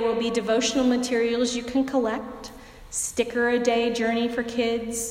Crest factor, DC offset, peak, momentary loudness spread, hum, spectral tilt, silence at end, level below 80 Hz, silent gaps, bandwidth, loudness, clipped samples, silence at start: 16 dB; under 0.1%; -8 dBFS; 8 LU; none; -3 dB/octave; 0 s; -52 dBFS; none; 16 kHz; -24 LUFS; under 0.1%; 0 s